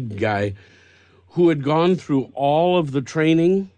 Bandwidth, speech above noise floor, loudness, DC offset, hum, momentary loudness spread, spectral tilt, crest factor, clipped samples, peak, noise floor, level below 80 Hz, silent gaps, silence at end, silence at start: 9.2 kHz; 34 dB; -19 LUFS; under 0.1%; none; 7 LU; -7.5 dB/octave; 12 dB; under 0.1%; -6 dBFS; -53 dBFS; -60 dBFS; none; 0.1 s; 0 s